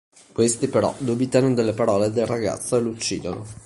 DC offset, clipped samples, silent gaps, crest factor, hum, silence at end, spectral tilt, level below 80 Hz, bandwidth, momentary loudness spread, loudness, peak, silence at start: under 0.1%; under 0.1%; none; 18 dB; none; 0.05 s; -5 dB/octave; -52 dBFS; 11.5 kHz; 7 LU; -22 LUFS; -4 dBFS; 0.35 s